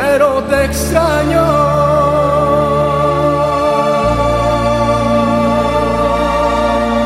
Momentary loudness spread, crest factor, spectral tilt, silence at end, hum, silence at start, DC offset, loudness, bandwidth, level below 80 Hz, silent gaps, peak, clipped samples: 2 LU; 12 dB; -6 dB/octave; 0 s; none; 0 s; under 0.1%; -13 LUFS; 16 kHz; -26 dBFS; none; 0 dBFS; under 0.1%